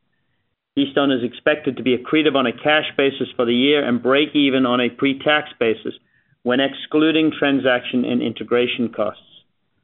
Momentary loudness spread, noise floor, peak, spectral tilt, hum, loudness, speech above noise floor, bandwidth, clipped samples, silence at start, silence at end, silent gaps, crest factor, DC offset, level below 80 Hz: 6 LU; -71 dBFS; -2 dBFS; -2.5 dB/octave; none; -19 LUFS; 53 dB; 4.2 kHz; under 0.1%; 0.75 s; 0.7 s; none; 16 dB; under 0.1%; -64 dBFS